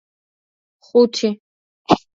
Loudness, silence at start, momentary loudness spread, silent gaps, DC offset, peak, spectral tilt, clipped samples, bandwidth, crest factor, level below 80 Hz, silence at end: -18 LUFS; 0.95 s; 18 LU; 1.40-1.85 s; under 0.1%; 0 dBFS; -5 dB/octave; under 0.1%; 7.8 kHz; 20 dB; -58 dBFS; 0.2 s